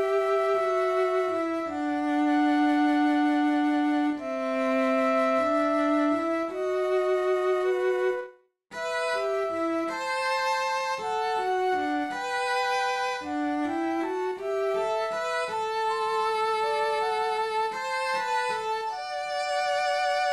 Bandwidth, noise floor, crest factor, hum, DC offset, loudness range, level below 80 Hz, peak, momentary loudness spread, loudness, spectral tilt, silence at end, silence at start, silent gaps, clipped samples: 12.5 kHz; -49 dBFS; 12 dB; none; under 0.1%; 3 LU; -70 dBFS; -14 dBFS; 6 LU; -26 LUFS; -3 dB/octave; 0 s; 0 s; none; under 0.1%